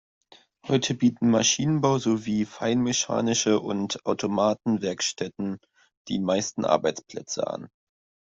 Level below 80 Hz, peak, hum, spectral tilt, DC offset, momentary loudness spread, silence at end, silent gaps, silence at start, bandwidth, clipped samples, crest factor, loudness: -64 dBFS; -4 dBFS; none; -4 dB/octave; under 0.1%; 11 LU; 0.65 s; 5.97-6.05 s; 0.65 s; 7.8 kHz; under 0.1%; 22 dB; -25 LUFS